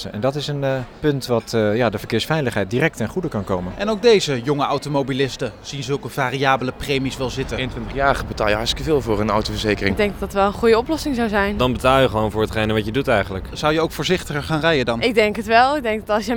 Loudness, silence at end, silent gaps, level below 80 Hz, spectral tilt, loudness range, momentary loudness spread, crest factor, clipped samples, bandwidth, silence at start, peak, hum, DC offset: -20 LUFS; 0 s; none; -36 dBFS; -5.5 dB/octave; 3 LU; 8 LU; 18 dB; under 0.1%; 19.5 kHz; 0 s; -2 dBFS; none; under 0.1%